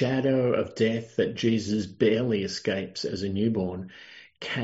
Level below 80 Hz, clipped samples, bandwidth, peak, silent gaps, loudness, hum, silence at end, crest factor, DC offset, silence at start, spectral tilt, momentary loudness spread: -64 dBFS; under 0.1%; 8 kHz; -10 dBFS; none; -27 LUFS; none; 0 s; 16 dB; under 0.1%; 0 s; -5.5 dB/octave; 14 LU